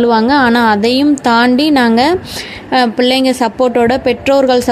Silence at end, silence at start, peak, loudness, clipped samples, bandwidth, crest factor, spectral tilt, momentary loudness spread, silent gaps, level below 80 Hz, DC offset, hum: 0 s; 0 s; 0 dBFS; -11 LUFS; under 0.1%; 14.5 kHz; 10 dB; -4.5 dB/octave; 4 LU; none; -42 dBFS; under 0.1%; none